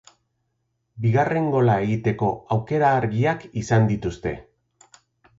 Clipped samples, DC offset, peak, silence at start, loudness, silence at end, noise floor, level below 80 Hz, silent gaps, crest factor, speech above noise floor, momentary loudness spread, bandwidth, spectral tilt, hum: under 0.1%; under 0.1%; -6 dBFS; 0.95 s; -22 LUFS; 1 s; -74 dBFS; -50 dBFS; none; 16 dB; 53 dB; 9 LU; 7.8 kHz; -7.5 dB/octave; none